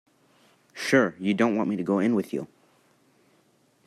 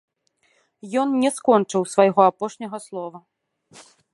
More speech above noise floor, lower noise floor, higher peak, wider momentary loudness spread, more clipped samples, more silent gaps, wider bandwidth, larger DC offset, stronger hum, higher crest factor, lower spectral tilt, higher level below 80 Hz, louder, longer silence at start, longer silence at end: second, 40 dB vs 46 dB; about the same, -64 dBFS vs -66 dBFS; second, -8 dBFS vs -2 dBFS; second, 13 LU vs 16 LU; neither; neither; first, 14 kHz vs 11.5 kHz; neither; neither; about the same, 20 dB vs 22 dB; about the same, -6 dB/octave vs -5.5 dB/octave; about the same, -72 dBFS vs -74 dBFS; second, -25 LUFS vs -20 LUFS; about the same, 0.75 s vs 0.85 s; first, 1.4 s vs 0.35 s